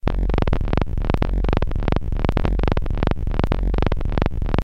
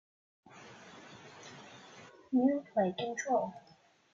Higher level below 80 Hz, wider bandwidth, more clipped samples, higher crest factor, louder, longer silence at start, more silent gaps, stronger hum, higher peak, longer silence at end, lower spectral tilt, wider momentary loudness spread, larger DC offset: first, -22 dBFS vs -80 dBFS; second, 6 kHz vs 7.4 kHz; neither; about the same, 20 dB vs 18 dB; first, -23 LUFS vs -33 LUFS; second, 0 s vs 0.55 s; neither; neither; first, 0 dBFS vs -18 dBFS; second, 0 s vs 0.55 s; first, -8.5 dB/octave vs -5 dB/octave; second, 2 LU vs 23 LU; first, 3% vs under 0.1%